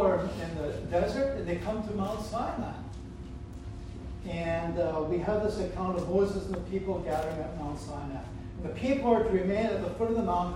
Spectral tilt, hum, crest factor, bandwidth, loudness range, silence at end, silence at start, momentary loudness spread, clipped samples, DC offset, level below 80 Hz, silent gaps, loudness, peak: -7 dB/octave; none; 18 dB; 16 kHz; 4 LU; 0 s; 0 s; 14 LU; under 0.1%; under 0.1%; -44 dBFS; none; -31 LUFS; -12 dBFS